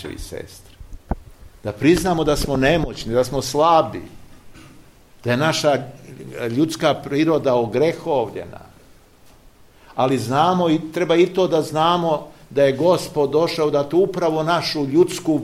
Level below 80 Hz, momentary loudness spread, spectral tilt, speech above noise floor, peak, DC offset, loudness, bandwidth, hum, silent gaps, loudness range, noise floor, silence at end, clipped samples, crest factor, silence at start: -40 dBFS; 15 LU; -5.5 dB/octave; 30 dB; -4 dBFS; 0.1%; -19 LUFS; 15.5 kHz; none; none; 4 LU; -49 dBFS; 0 s; under 0.1%; 16 dB; 0 s